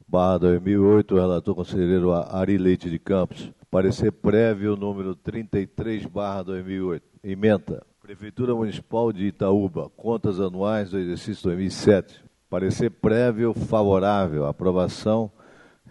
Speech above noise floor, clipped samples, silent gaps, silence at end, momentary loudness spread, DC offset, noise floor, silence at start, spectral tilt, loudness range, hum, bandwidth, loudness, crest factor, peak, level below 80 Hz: 30 dB; under 0.1%; none; 0.6 s; 11 LU; under 0.1%; -52 dBFS; 0.1 s; -8 dB/octave; 5 LU; none; 11 kHz; -23 LUFS; 20 dB; -2 dBFS; -50 dBFS